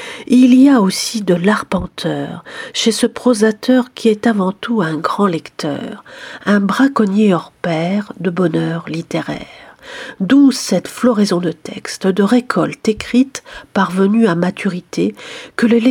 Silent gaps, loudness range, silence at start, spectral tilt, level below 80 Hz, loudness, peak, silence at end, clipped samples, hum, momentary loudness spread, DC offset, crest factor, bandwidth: none; 2 LU; 0 s; -5.5 dB/octave; -50 dBFS; -15 LUFS; 0 dBFS; 0 s; under 0.1%; none; 14 LU; under 0.1%; 14 dB; 16 kHz